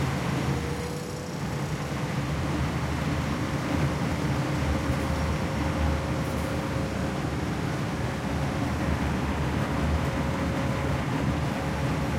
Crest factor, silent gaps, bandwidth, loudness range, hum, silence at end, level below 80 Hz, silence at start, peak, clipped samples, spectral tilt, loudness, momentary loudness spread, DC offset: 14 dB; none; 16 kHz; 2 LU; none; 0 s; -36 dBFS; 0 s; -14 dBFS; under 0.1%; -6 dB/octave; -28 LUFS; 3 LU; under 0.1%